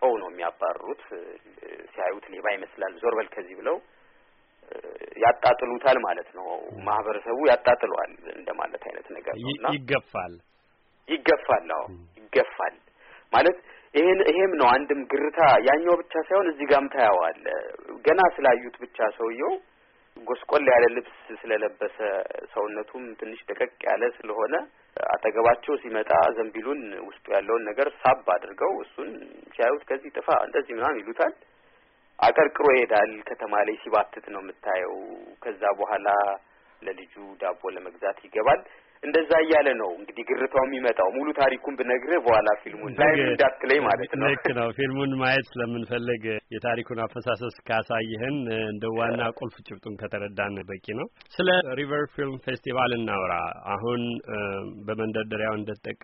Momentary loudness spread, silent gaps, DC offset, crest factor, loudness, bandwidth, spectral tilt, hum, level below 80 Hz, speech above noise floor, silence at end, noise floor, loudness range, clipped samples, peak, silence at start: 17 LU; none; under 0.1%; 18 dB; -25 LUFS; 5.6 kHz; -3 dB/octave; none; -60 dBFS; 39 dB; 0.1 s; -64 dBFS; 7 LU; under 0.1%; -8 dBFS; 0 s